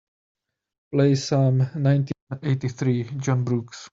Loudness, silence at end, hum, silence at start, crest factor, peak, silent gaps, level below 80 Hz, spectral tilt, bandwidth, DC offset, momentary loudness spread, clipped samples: -23 LUFS; 0.05 s; none; 0.9 s; 16 dB; -8 dBFS; 2.22-2.27 s; -62 dBFS; -7 dB/octave; 7.6 kHz; under 0.1%; 8 LU; under 0.1%